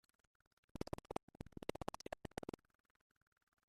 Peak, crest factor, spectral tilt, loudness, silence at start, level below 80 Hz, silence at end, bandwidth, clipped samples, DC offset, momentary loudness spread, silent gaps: -24 dBFS; 28 dB; -5.5 dB/octave; -51 LUFS; 0.75 s; -66 dBFS; 1.3 s; 14.5 kHz; under 0.1%; under 0.1%; 9 LU; 1.23-1.28 s